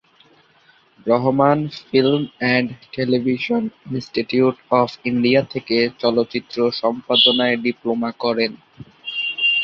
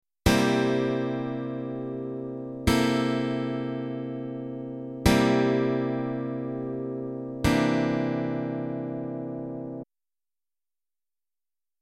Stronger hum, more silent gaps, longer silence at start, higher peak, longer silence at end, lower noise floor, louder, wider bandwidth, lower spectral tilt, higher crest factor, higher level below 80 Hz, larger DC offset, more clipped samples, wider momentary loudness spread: neither; neither; first, 1.05 s vs 0.25 s; first, -2 dBFS vs -6 dBFS; second, 0 s vs 1.95 s; second, -55 dBFS vs under -90 dBFS; first, -19 LUFS vs -28 LUFS; second, 6.8 kHz vs 16 kHz; about the same, -6.5 dB/octave vs -6 dB/octave; about the same, 18 dB vs 22 dB; second, -60 dBFS vs -44 dBFS; neither; neither; second, 9 LU vs 12 LU